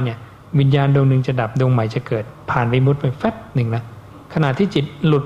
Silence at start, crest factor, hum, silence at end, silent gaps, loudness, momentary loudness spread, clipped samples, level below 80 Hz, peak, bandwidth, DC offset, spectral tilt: 0 s; 14 dB; none; 0 s; none; -18 LUFS; 10 LU; under 0.1%; -48 dBFS; -2 dBFS; 7.2 kHz; under 0.1%; -8.5 dB/octave